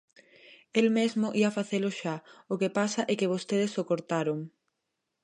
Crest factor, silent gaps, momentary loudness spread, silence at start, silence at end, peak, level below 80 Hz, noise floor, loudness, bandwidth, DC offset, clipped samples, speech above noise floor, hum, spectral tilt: 20 dB; none; 10 LU; 0.5 s; 0.75 s; -10 dBFS; -80 dBFS; -83 dBFS; -29 LUFS; 10.5 kHz; under 0.1%; under 0.1%; 54 dB; none; -5.5 dB/octave